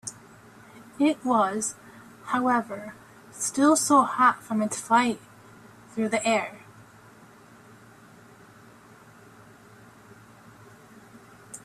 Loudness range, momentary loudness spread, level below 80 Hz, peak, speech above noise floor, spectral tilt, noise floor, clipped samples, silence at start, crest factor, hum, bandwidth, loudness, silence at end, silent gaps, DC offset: 9 LU; 21 LU; -70 dBFS; -8 dBFS; 28 dB; -3.5 dB/octave; -52 dBFS; under 0.1%; 0.05 s; 22 dB; none; 14.5 kHz; -24 LUFS; 0.05 s; none; under 0.1%